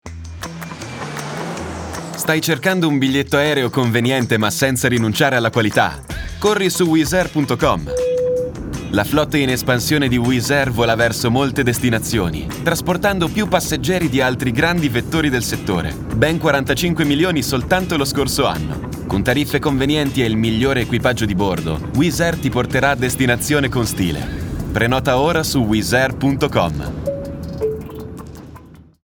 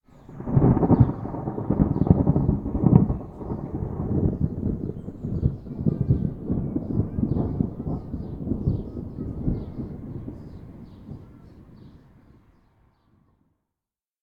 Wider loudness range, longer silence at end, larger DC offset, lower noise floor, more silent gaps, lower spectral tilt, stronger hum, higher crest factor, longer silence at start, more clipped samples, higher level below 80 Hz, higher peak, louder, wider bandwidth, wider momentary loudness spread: second, 2 LU vs 15 LU; second, 0.25 s vs 2.25 s; neither; second, -41 dBFS vs -90 dBFS; neither; second, -5 dB/octave vs -13 dB/octave; neither; second, 16 dB vs 24 dB; second, 0.05 s vs 0.3 s; neither; about the same, -34 dBFS vs -36 dBFS; about the same, -2 dBFS vs -2 dBFS; first, -17 LUFS vs -25 LUFS; first, over 20 kHz vs 2.6 kHz; second, 10 LU vs 18 LU